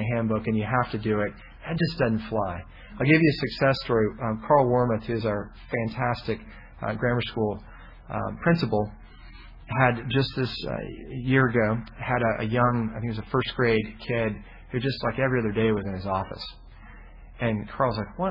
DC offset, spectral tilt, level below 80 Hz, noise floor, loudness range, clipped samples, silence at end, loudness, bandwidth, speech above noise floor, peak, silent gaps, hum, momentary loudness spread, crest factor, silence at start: under 0.1%; -9 dB/octave; -46 dBFS; -45 dBFS; 5 LU; under 0.1%; 0 s; -26 LUFS; 5.8 kHz; 20 dB; -6 dBFS; none; none; 11 LU; 20 dB; 0 s